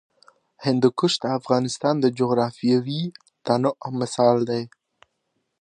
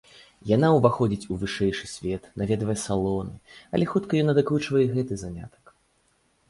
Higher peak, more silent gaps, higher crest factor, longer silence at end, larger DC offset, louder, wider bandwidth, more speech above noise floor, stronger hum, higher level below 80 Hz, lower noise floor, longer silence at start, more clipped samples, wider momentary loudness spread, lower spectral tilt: about the same, -4 dBFS vs -4 dBFS; neither; about the same, 18 dB vs 20 dB; about the same, 0.95 s vs 1 s; neither; first, -22 LUFS vs -25 LUFS; second, 9.8 kHz vs 11.5 kHz; first, 53 dB vs 42 dB; neither; second, -68 dBFS vs -50 dBFS; first, -75 dBFS vs -67 dBFS; first, 0.6 s vs 0.45 s; neither; second, 10 LU vs 13 LU; about the same, -6 dB/octave vs -6.5 dB/octave